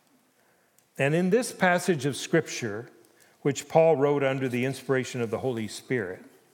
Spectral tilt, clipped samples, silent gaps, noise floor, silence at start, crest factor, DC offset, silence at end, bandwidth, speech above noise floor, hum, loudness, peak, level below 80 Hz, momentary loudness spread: -5.5 dB/octave; under 0.1%; none; -65 dBFS; 1 s; 22 dB; under 0.1%; 0.25 s; 17.5 kHz; 39 dB; none; -26 LUFS; -6 dBFS; -78 dBFS; 11 LU